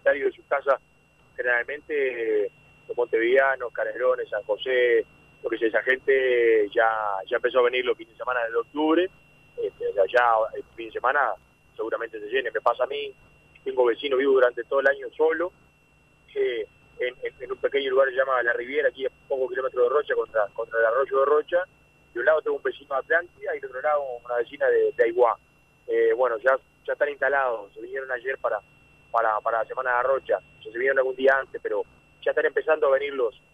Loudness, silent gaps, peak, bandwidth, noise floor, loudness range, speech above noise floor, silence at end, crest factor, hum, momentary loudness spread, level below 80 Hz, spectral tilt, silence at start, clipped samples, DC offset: -25 LUFS; none; -8 dBFS; 5.2 kHz; -60 dBFS; 4 LU; 36 dB; 0.25 s; 16 dB; 60 Hz at -70 dBFS; 12 LU; -64 dBFS; -5.5 dB/octave; 0.05 s; under 0.1%; under 0.1%